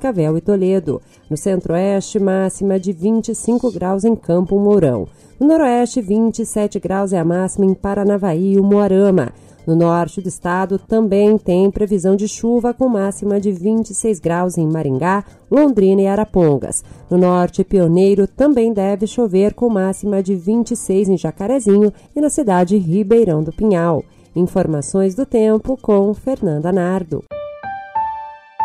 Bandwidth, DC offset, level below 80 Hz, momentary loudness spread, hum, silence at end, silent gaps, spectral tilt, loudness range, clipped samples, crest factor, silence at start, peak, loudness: 12.5 kHz; under 0.1%; -42 dBFS; 8 LU; none; 0 s; none; -7 dB/octave; 3 LU; under 0.1%; 12 dB; 0 s; -4 dBFS; -16 LUFS